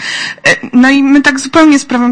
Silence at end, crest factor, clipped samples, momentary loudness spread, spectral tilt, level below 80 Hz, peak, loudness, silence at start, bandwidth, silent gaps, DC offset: 0 s; 8 dB; 0.7%; 4 LU; -3 dB/octave; -44 dBFS; 0 dBFS; -8 LUFS; 0 s; 9.8 kHz; none; under 0.1%